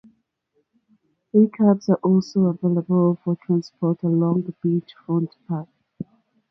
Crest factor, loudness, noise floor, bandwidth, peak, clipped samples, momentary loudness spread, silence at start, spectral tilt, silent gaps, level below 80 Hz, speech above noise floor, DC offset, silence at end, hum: 16 dB; -21 LUFS; -71 dBFS; 6.2 kHz; -6 dBFS; under 0.1%; 12 LU; 1.35 s; -9.5 dB/octave; none; -68 dBFS; 50 dB; under 0.1%; 0.5 s; none